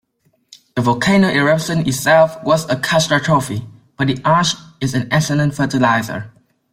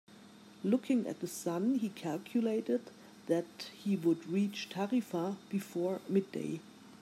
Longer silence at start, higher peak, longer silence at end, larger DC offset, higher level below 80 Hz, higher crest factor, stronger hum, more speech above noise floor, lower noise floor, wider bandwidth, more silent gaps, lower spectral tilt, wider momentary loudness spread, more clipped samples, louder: first, 0.75 s vs 0.1 s; first, -2 dBFS vs -18 dBFS; first, 0.45 s vs 0.05 s; neither; first, -50 dBFS vs -86 dBFS; about the same, 14 dB vs 16 dB; neither; first, 47 dB vs 22 dB; first, -62 dBFS vs -56 dBFS; about the same, 16 kHz vs 15.5 kHz; neither; about the same, -5 dB/octave vs -6 dB/octave; about the same, 9 LU vs 8 LU; neither; first, -16 LUFS vs -35 LUFS